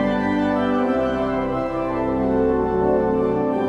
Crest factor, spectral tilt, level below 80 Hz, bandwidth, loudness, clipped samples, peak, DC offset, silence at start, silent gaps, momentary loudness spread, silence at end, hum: 12 dB; -8.5 dB/octave; -40 dBFS; 7.8 kHz; -21 LUFS; under 0.1%; -8 dBFS; under 0.1%; 0 s; none; 4 LU; 0 s; none